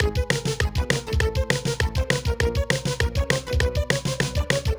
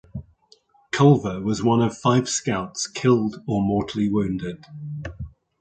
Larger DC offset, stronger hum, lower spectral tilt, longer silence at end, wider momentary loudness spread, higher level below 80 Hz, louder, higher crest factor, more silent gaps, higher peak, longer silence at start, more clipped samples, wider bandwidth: neither; neither; second, -4.5 dB/octave vs -6 dB/octave; second, 0 s vs 0.3 s; second, 2 LU vs 18 LU; first, -28 dBFS vs -48 dBFS; about the same, -24 LUFS vs -22 LUFS; about the same, 22 dB vs 18 dB; neither; about the same, -2 dBFS vs -4 dBFS; second, 0 s vs 0.15 s; neither; first, over 20 kHz vs 9.4 kHz